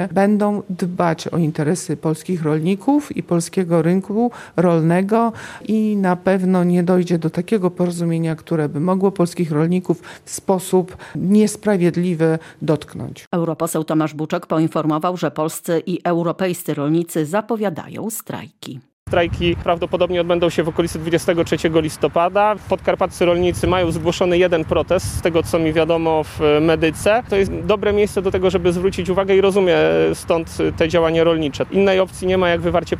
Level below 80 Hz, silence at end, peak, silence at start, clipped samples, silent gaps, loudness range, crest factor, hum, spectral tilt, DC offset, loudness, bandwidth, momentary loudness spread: -42 dBFS; 0 s; -2 dBFS; 0 s; under 0.1%; 13.27-13.31 s, 18.93-19.06 s; 4 LU; 16 dB; none; -6 dB/octave; under 0.1%; -18 LUFS; 16 kHz; 7 LU